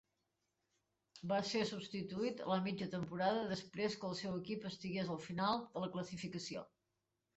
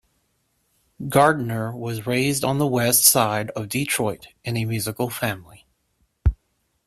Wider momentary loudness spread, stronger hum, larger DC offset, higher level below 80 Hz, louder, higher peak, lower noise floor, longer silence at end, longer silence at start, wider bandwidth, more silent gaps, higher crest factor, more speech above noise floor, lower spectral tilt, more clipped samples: second, 8 LU vs 14 LU; neither; neither; second, -76 dBFS vs -36 dBFS; second, -41 LUFS vs -21 LUFS; second, -24 dBFS vs 0 dBFS; first, -88 dBFS vs -70 dBFS; first, 0.7 s vs 0.55 s; first, 1.15 s vs 1 s; second, 8.2 kHz vs 16 kHz; neither; about the same, 20 dB vs 22 dB; about the same, 47 dB vs 48 dB; first, -5.5 dB/octave vs -3.5 dB/octave; neither